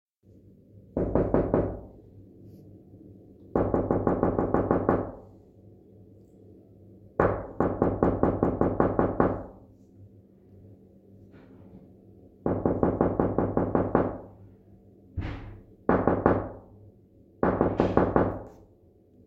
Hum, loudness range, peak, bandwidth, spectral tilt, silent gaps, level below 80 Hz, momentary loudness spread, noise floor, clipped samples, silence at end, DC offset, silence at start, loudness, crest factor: none; 5 LU; -4 dBFS; 5.4 kHz; -11 dB/octave; none; -44 dBFS; 14 LU; -58 dBFS; under 0.1%; 0.75 s; under 0.1%; 0.75 s; -27 LUFS; 24 dB